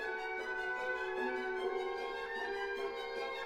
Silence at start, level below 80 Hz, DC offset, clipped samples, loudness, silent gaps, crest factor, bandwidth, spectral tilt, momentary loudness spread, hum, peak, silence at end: 0 s; -68 dBFS; under 0.1%; under 0.1%; -39 LUFS; none; 12 dB; 14 kHz; -3 dB/octave; 3 LU; none; -26 dBFS; 0 s